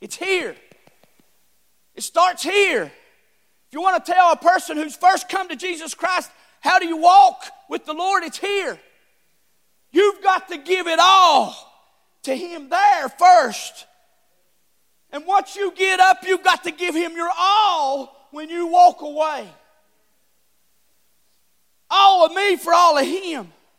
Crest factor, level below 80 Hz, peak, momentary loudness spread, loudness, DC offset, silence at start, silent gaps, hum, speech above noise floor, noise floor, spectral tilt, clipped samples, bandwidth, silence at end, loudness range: 18 dB; -76 dBFS; -2 dBFS; 18 LU; -17 LUFS; under 0.1%; 0 s; none; none; 49 dB; -67 dBFS; -1 dB/octave; under 0.1%; 16 kHz; 0.3 s; 5 LU